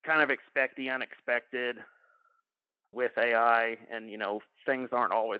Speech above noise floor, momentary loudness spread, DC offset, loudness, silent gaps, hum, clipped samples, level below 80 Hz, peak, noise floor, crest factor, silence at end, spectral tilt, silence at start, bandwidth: 57 dB; 11 LU; under 0.1%; -30 LUFS; none; none; under 0.1%; -88 dBFS; -10 dBFS; -87 dBFS; 20 dB; 0 s; -0.5 dB/octave; 0.05 s; 5.2 kHz